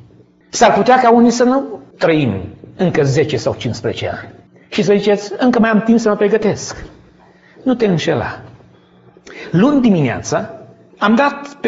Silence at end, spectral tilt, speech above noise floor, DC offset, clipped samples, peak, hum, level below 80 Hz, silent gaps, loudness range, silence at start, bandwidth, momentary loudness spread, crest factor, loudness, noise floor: 0 s; -5.5 dB/octave; 33 dB; under 0.1%; under 0.1%; 0 dBFS; none; -48 dBFS; none; 5 LU; 0.55 s; 8 kHz; 15 LU; 16 dB; -14 LUFS; -47 dBFS